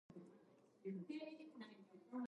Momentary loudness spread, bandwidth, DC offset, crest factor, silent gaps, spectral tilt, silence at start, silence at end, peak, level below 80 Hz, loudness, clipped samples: 13 LU; 10.5 kHz; under 0.1%; 16 dB; none; -7.5 dB/octave; 0.1 s; 0.05 s; -38 dBFS; under -90 dBFS; -54 LUFS; under 0.1%